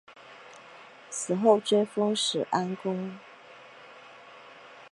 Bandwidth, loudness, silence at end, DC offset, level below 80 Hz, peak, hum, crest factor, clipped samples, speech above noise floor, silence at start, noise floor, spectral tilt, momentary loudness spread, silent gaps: 11.5 kHz; -27 LUFS; 0.05 s; under 0.1%; -82 dBFS; -8 dBFS; none; 22 dB; under 0.1%; 24 dB; 0.1 s; -50 dBFS; -4 dB/octave; 25 LU; none